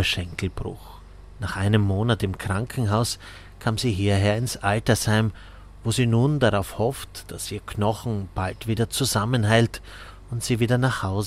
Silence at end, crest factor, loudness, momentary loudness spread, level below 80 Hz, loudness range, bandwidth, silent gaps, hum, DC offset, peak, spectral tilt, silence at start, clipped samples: 0 s; 20 dB; -24 LUFS; 14 LU; -44 dBFS; 3 LU; 16 kHz; none; none; under 0.1%; -4 dBFS; -5.5 dB/octave; 0 s; under 0.1%